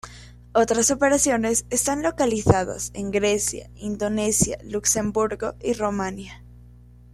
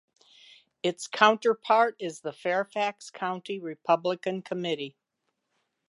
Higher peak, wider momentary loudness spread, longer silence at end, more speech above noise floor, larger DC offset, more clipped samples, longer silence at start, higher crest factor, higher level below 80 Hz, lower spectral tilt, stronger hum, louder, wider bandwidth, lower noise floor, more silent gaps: about the same, -2 dBFS vs -4 dBFS; second, 10 LU vs 13 LU; second, 0.5 s vs 1 s; second, 25 dB vs 53 dB; neither; neither; second, 0.05 s vs 0.85 s; about the same, 22 dB vs 26 dB; first, -44 dBFS vs -84 dBFS; about the same, -4 dB/octave vs -4 dB/octave; first, 60 Hz at -40 dBFS vs none; first, -22 LUFS vs -28 LUFS; first, 15 kHz vs 11.5 kHz; second, -47 dBFS vs -80 dBFS; neither